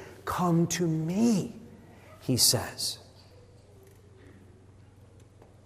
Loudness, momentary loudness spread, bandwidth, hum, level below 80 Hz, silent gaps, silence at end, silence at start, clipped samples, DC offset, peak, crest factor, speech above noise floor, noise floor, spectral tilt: -27 LUFS; 18 LU; 16 kHz; none; -62 dBFS; none; 1.35 s; 0 s; under 0.1%; under 0.1%; -8 dBFS; 22 dB; 28 dB; -54 dBFS; -4 dB/octave